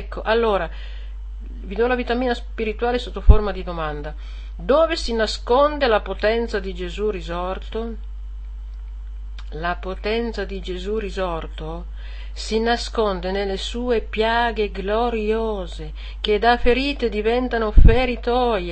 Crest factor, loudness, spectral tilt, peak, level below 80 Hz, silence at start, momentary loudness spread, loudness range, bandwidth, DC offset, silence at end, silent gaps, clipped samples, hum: 20 dB; -22 LUFS; -6 dB/octave; 0 dBFS; -24 dBFS; 0 s; 18 LU; 8 LU; 8.6 kHz; 0.4%; 0 s; none; under 0.1%; none